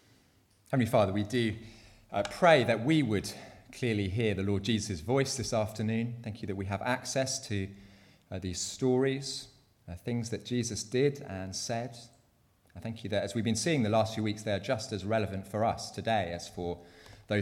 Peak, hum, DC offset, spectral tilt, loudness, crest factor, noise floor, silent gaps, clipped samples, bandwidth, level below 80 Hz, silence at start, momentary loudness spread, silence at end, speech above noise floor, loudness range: -10 dBFS; none; under 0.1%; -5 dB/octave; -31 LUFS; 22 dB; -67 dBFS; none; under 0.1%; 16 kHz; -60 dBFS; 0.7 s; 13 LU; 0 s; 36 dB; 6 LU